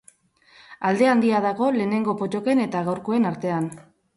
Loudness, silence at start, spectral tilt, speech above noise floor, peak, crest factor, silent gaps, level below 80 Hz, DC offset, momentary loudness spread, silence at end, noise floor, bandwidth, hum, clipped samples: -22 LUFS; 0.7 s; -7 dB/octave; 35 dB; -6 dBFS; 16 dB; none; -68 dBFS; under 0.1%; 8 LU; 0.35 s; -57 dBFS; 11.5 kHz; none; under 0.1%